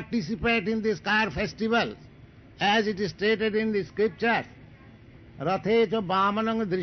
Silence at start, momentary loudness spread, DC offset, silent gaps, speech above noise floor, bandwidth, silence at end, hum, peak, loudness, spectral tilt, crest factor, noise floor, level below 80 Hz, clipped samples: 0 s; 6 LU; under 0.1%; none; 25 dB; 6.4 kHz; 0 s; none; -14 dBFS; -26 LUFS; -3 dB/octave; 14 dB; -50 dBFS; -52 dBFS; under 0.1%